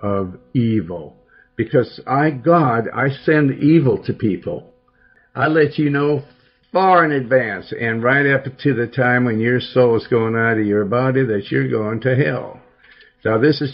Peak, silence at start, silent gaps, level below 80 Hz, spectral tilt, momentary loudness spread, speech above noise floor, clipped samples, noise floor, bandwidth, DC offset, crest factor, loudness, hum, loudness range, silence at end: -2 dBFS; 0 s; none; -56 dBFS; -10.5 dB/octave; 10 LU; 38 dB; under 0.1%; -55 dBFS; 5.8 kHz; under 0.1%; 16 dB; -17 LUFS; none; 2 LU; 0 s